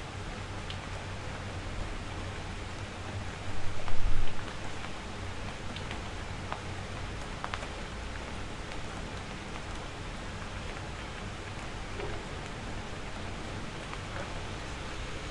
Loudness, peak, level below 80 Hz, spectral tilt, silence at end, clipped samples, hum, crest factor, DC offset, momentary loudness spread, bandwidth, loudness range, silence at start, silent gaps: -39 LUFS; -12 dBFS; -40 dBFS; -4.5 dB/octave; 0 s; under 0.1%; none; 20 dB; under 0.1%; 2 LU; 11 kHz; 1 LU; 0 s; none